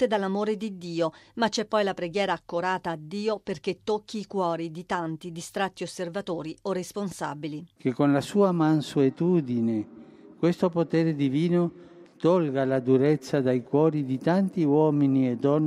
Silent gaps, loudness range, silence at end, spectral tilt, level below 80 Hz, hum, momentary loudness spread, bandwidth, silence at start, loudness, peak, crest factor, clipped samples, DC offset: none; 7 LU; 0 s; -7 dB/octave; -68 dBFS; none; 10 LU; 13.5 kHz; 0 s; -26 LUFS; -10 dBFS; 16 dB; under 0.1%; under 0.1%